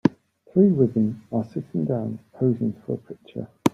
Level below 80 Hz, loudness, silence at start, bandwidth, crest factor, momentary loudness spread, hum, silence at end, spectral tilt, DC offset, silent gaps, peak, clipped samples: -62 dBFS; -24 LUFS; 0.05 s; 14 kHz; 20 dB; 14 LU; none; 0.05 s; -8.5 dB/octave; under 0.1%; none; -2 dBFS; under 0.1%